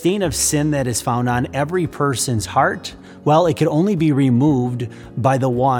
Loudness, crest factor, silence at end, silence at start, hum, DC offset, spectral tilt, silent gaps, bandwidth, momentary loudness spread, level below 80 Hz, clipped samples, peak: -18 LUFS; 16 dB; 0 s; 0 s; none; under 0.1%; -5.5 dB/octave; none; 18.5 kHz; 8 LU; -44 dBFS; under 0.1%; -2 dBFS